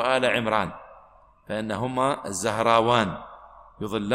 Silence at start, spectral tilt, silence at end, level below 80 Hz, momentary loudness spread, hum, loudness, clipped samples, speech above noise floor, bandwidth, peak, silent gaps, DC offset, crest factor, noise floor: 0 s; -4.5 dB/octave; 0 s; -56 dBFS; 16 LU; none; -24 LUFS; under 0.1%; 30 dB; 16 kHz; -6 dBFS; none; under 0.1%; 20 dB; -54 dBFS